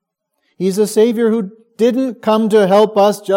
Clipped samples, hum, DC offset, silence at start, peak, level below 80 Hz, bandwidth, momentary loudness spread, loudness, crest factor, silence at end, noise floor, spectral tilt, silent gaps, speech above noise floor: under 0.1%; none; under 0.1%; 0.6 s; 0 dBFS; -70 dBFS; 16.5 kHz; 9 LU; -14 LUFS; 14 dB; 0 s; -68 dBFS; -5.5 dB/octave; none; 55 dB